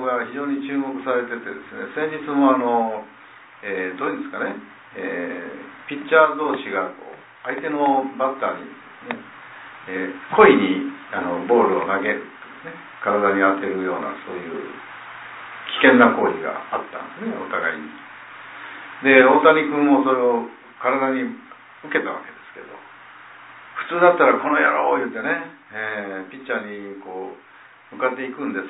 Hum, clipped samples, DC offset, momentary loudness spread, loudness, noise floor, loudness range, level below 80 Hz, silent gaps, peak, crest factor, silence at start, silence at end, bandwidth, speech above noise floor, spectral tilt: none; under 0.1%; under 0.1%; 22 LU; -20 LUFS; -43 dBFS; 8 LU; -66 dBFS; none; 0 dBFS; 22 dB; 0 s; 0 s; 4 kHz; 23 dB; -9 dB/octave